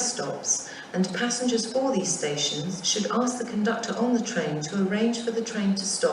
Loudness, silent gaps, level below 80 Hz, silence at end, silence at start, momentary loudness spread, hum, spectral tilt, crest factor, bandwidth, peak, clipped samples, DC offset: -26 LUFS; none; -70 dBFS; 0 s; 0 s; 4 LU; none; -3.5 dB/octave; 16 dB; 11.5 kHz; -12 dBFS; under 0.1%; under 0.1%